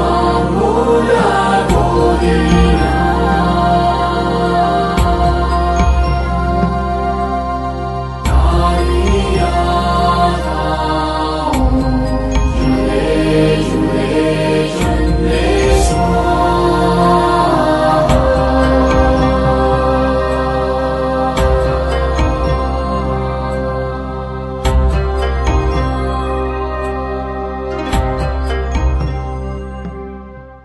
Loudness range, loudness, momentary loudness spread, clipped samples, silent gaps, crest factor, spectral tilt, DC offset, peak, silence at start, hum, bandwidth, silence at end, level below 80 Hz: 6 LU; -14 LUFS; 8 LU; under 0.1%; none; 14 dB; -6.5 dB/octave; under 0.1%; 0 dBFS; 0 s; none; 11.5 kHz; 0.05 s; -18 dBFS